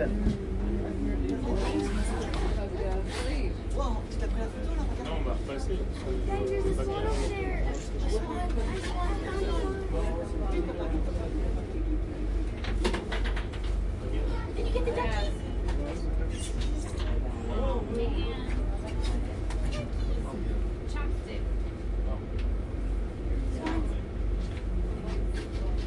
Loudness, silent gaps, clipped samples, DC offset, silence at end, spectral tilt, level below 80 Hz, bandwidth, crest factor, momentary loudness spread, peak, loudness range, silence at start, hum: -32 LUFS; none; under 0.1%; under 0.1%; 0 s; -6.5 dB/octave; -32 dBFS; 11 kHz; 14 dB; 4 LU; -14 dBFS; 2 LU; 0 s; none